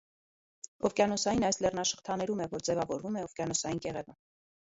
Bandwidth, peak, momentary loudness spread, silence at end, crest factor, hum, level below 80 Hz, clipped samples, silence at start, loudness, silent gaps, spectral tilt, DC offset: 8 kHz; -14 dBFS; 12 LU; 0.55 s; 20 dB; none; -60 dBFS; under 0.1%; 0.65 s; -32 LUFS; 0.68-0.79 s; -3.5 dB/octave; under 0.1%